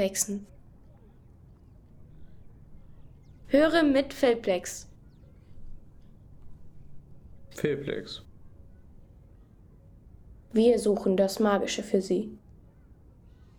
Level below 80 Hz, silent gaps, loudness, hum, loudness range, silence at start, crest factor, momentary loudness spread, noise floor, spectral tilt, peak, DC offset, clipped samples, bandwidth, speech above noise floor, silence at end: -54 dBFS; none; -26 LUFS; none; 11 LU; 0 s; 20 dB; 16 LU; -54 dBFS; -4.5 dB/octave; -10 dBFS; under 0.1%; under 0.1%; 19 kHz; 28 dB; 1.2 s